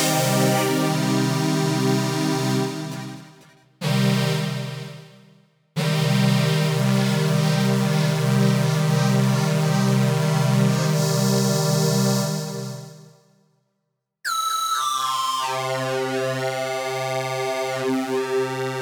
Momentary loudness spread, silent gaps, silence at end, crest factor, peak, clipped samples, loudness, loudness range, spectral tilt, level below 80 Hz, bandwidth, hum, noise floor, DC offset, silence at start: 8 LU; none; 0 s; 14 dB; -8 dBFS; under 0.1%; -21 LUFS; 6 LU; -5 dB/octave; -70 dBFS; over 20 kHz; none; -77 dBFS; under 0.1%; 0 s